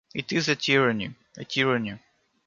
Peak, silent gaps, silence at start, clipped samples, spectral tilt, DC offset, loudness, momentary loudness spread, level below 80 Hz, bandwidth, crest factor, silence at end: -8 dBFS; none; 0.15 s; under 0.1%; -4.5 dB/octave; under 0.1%; -24 LUFS; 16 LU; -64 dBFS; 7.4 kHz; 20 dB; 0.5 s